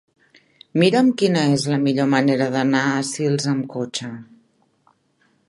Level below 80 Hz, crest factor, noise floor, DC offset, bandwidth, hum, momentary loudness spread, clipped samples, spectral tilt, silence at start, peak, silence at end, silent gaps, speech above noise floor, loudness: -66 dBFS; 18 dB; -63 dBFS; under 0.1%; 11.5 kHz; none; 10 LU; under 0.1%; -5.5 dB/octave; 0.75 s; -2 dBFS; 1.25 s; none; 44 dB; -19 LUFS